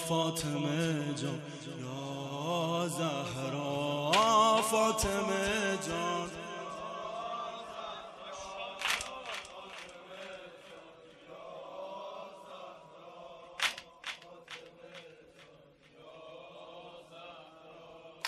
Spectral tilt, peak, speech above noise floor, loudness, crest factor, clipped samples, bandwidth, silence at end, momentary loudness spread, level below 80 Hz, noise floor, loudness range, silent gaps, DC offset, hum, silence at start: -4 dB/octave; -14 dBFS; 26 dB; -33 LUFS; 22 dB; under 0.1%; 13 kHz; 0 s; 23 LU; -60 dBFS; -60 dBFS; 19 LU; none; under 0.1%; none; 0 s